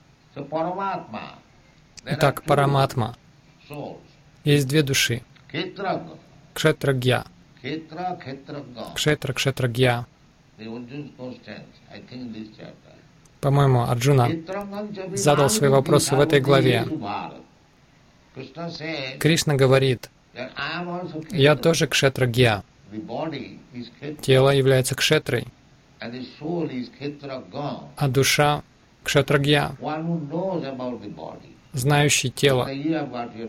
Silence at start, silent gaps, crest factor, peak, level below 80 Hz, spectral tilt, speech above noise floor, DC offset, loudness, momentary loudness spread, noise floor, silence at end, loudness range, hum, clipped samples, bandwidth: 0.35 s; none; 18 dB; -6 dBFS; -52 dBFS; -5 dB/octave; 33 dB; under 0.1%; -22 LUFS; 19 LU; -55 dBFS; 0 s; 6 LU; none; under 0.1%; 16.5 kHz